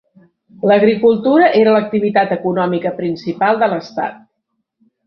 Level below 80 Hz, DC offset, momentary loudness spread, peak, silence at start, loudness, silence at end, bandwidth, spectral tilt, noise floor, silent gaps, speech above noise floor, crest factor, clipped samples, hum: -60 dBFS; under 0.1%; 11 LU; -2 dBFS; 0.65 s; -14 LUFS; 0.9 s; 6.2 kHz; -8 dB/octave; -72 dBFS; none; 58 dB; 14 dB; under 0.1%; none